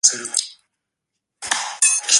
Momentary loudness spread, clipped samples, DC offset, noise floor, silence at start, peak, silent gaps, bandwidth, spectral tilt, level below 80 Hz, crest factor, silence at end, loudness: 17 LU; under 0.1%; under 0.1%; -80 dBFS; 0.05 s; 0 dBFS; none; 16 kHz; 3 dB/octave; -70 dBFS; 22 dB; 0 s; -19 LUFS